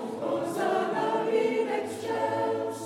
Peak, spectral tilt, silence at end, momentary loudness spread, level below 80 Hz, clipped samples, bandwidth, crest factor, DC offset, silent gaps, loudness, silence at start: -14 dBFS; -5 dB/octave; 0 s; 5 LU; -82 dBFS; under 0.1%; 15.5 kHz; 14 dB; under 0.1%; none; -28 LUFS; 0 s